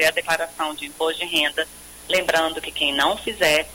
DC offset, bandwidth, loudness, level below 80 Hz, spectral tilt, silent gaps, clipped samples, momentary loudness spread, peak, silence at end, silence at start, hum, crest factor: under 0.1%; 17 kHz; -21 LUFS; -50 dBFS; -1.5 dB/octave; none; under 0.1%; 8 LU; -6 dBFS; 0 s; 0 s; none; 16 dB